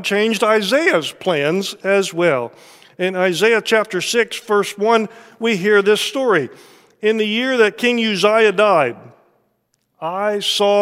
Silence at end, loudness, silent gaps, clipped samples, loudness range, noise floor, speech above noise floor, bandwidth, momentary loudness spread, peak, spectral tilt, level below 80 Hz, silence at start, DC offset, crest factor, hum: 0 s; -16 LUFS; none; under 0.1%; 2 LU; -67 dBFS; 50 dB; 15.5 kHz; 8 LU; 0 dBFS; -3.5 dB/octave; -70 dBFS; 0 s; under 0.1%; 16 dB; none